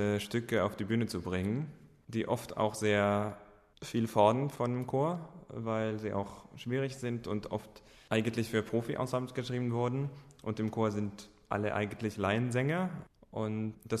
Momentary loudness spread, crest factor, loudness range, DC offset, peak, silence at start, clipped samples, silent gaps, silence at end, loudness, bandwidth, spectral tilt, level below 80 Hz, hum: 12 LU; 22 dB; 4 LU; under 0.1%; -12 dBFS; 0 s; under 0.1%; none; 0 s; -34 LUFS; 13.5 kHz; -6.5 dB/octave; -64 dBFS; none